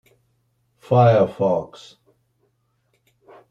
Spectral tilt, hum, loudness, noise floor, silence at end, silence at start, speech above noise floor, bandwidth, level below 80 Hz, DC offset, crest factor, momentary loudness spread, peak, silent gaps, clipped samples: -8.5 dB/octave; none; -18 LUFS; -68 dBFS; 1.85 s; 0.9 s; 50 dB; 7.4 kHz; -62 dBFS; under 0.1%; 20 dB; 11 LU; -4 dBFS; none; under 0.1%